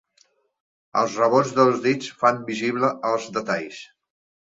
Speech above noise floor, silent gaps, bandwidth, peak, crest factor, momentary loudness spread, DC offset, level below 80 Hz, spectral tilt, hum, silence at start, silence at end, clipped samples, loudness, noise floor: 41 dB; none; 7.8 kHz; -4 dBFS; 20 dB; 9 LU; under 0.1%; -68 dBFS; -5 dB/octave; none; 0.95 s; 0.65 s; under 0.1%; -22 LUFS; -63 dBFS